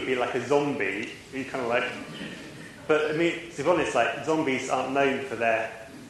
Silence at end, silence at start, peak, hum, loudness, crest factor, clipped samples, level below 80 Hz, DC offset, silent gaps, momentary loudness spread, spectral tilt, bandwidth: 0 s; 0 s; -10 dBFS; none; -27 LUFS; 18 dB; under 0.1%; -62 dBFS; under 0.1%; none; 13 LU; -4.5 dB/octave; 12.5 kHz